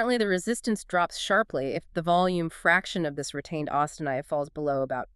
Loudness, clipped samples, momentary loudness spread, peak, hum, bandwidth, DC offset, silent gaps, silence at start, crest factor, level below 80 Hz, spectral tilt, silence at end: -27 LUFS; under 0.1%; 8 LU; -8 dBFS; none; 13.5 kHz; under 0.1%; none; 0 s; 20 dB; -56 dBFS; -4.5 dB/octave; 0.1 s